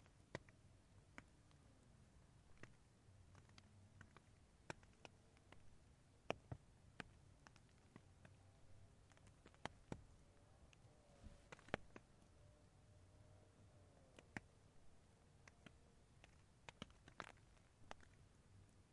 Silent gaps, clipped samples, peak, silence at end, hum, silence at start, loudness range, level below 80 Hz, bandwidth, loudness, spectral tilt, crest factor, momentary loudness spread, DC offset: none; under 0.1%; -24 dBFS; 0 s; none; 0 s; 6 LU; -74 dBFS; 11 kHz; -61 LUFS; -5 dB/octave; 40 dB; 16 LU; under 0.1%